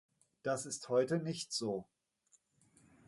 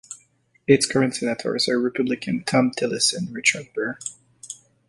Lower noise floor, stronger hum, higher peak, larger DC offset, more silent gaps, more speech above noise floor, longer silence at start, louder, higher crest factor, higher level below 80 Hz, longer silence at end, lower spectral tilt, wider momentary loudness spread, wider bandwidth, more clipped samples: first, -74 dBFS vs -61 dBFS; neither; second, -20 dBFS vs -2 dBFS; neither; neither; about the same, 37 dB vs 39 dB; first, 0.45 s vs 0.1 s; second, -38 LUFS vs -22 LUFS; about the same, 20 dB vs 22 dB; second, -80 dBFS vs -62 dBFS; first, 1.25 s vs 0.35 s; about the same, -4.5 dB/octave vs -3.5 dB/octave; second, 9 LU vs 19 LU; about the same, 11.5 kHz vs 11.5 kHz; neither